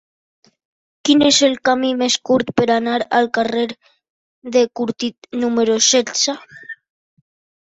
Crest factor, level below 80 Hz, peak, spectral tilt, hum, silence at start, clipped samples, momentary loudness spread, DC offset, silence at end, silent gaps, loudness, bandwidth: 18 dB; -58 dBFS; -2 dBFS; -2.5 dB/octave; none; 1.05 s; under 0.1%; 15 LU; under 0.1%; 0.9 s; 4.10-4.42 s, 5.18-5.22 s; -16 LUFS; 8.2 kHz